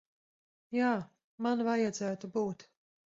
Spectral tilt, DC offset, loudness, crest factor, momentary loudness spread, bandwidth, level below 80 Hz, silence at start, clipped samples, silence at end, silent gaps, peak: -5.5 dB/octave; under 0.1%; -34 LUFS; 18 dB; 8 LU; 7.8 kHz; -78 dBFS; 0.7 s; under 0.1%; 0.55 s; 1.24-1.38 s; -18 dBFS